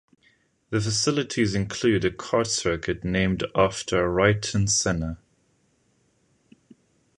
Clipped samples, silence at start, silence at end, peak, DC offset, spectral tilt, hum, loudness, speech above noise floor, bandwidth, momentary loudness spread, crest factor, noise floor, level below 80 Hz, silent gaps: under 0.1%; 0.7 s; 2 s; -4 dBFS; under 0.1%; -4 dB/octave; none; -24 LUFS; 43 dB; 11.5 kHz; 6 LU; 22 dB; -66 dBFS; -46 dBFS; none